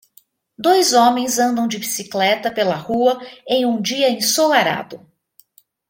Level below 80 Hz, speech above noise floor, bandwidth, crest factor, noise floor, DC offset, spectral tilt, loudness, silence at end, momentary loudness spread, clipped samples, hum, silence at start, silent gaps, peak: -62 dBFS; 37 dB; 17 kHz; 16 dB; -54 dBFS; under 0.1%; -2.5 dB/octave; -17 LUFS; 0.9 s; 9 LU; under 0.1%; none; 0.6 s; none; -2 dBFS